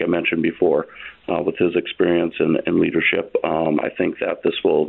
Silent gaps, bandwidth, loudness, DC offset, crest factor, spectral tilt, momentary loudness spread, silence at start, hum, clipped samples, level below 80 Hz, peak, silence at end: none; 4.1 kHz; -20 LUFS; under 0.1%; 14 dB; -10.5 dB/octave; 5 LU; 0 s; none; under 0.1%; -56 dBFS; -6 dBFS; 0 s